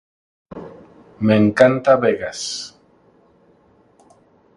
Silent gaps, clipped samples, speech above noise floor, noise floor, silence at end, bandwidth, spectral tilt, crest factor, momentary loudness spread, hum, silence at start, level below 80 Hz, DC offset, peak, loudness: none; under 0.1%; 39 dB; -55 dBFS; 1.9 s; 11 kHz; -5.5 dB/octave; 20 dB; 24 LU; none; 0.5 s; -54 dBFS; under 0.1%; 0 dBFS; -17 LUFS